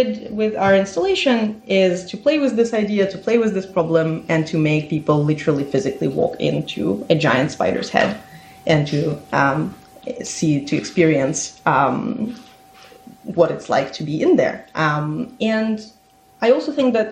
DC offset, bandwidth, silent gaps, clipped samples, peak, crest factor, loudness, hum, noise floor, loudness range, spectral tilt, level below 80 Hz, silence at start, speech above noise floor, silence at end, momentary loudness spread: under 0.1%; 11 kHz; none; under 0.1%; -2 dBFS; 18 dB; -19 LUFS; none; -45 dBFS; 2 LU; -5.5 dB/octave; -56 dBFS; 0 s; 27 dB; 0 s; 8 LU